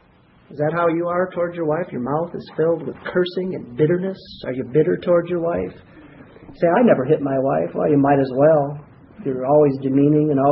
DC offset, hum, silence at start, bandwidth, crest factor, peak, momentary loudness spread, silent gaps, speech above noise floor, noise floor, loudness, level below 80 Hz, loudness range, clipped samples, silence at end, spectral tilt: under 0.1%; none; 0.5 s; 5.6 kHz; 16 dB; -2 dBFS; 12 LU; none; 34 dB; -53 dBFS; -19 LUFS; -56 dBFS; 5 LU; under 0.1%; 0 s; -12 dB/octave